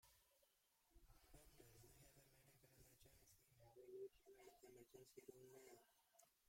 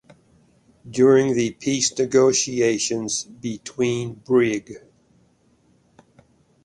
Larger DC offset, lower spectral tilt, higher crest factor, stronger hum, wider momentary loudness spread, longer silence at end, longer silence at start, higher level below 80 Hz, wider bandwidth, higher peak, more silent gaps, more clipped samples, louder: neither; about the same, -4.5 dB/octave vs -4 dB/octave; about the same, 20 dB vs 18 dB; neither; second, 9 LU vs 14 LU; second, 0 s vs 1.85 s; second, 0 s vs 0.85 s; second, -80 dBFS vs -60 dBFS; first, 16.5 kHz vs 11.5 kHz; second, -48 dBFS vs -4 dBFS; neither; neither; second, -65 LUFS vs -21 LUFS